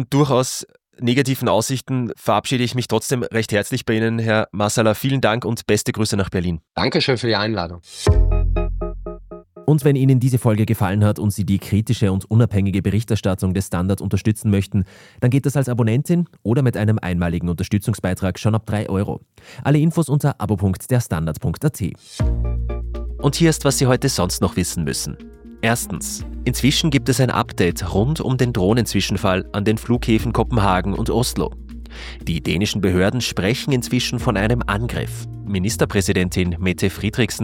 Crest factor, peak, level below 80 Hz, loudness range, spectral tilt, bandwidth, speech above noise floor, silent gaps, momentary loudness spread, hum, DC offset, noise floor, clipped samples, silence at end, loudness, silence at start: 16 dB; -2 dBFS; -32 dBFS; 2 LU; -5.5 dB/octave; 17 kHz; 20 dB; none; 8 LU; none; under 0.1%; -39 dBFS; under 0.1%; 0 s; -20 LUFS; 0 s